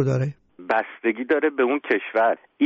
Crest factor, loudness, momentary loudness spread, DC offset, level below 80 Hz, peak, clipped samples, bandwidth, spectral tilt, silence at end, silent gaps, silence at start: 14 dB; -23 LUFS; 5 LU; under 0.1%; -64 dBFS; -8 dBFS; under 0.1%; 7.6 kHz; -6 dB/octave; 0 s; none; 0 s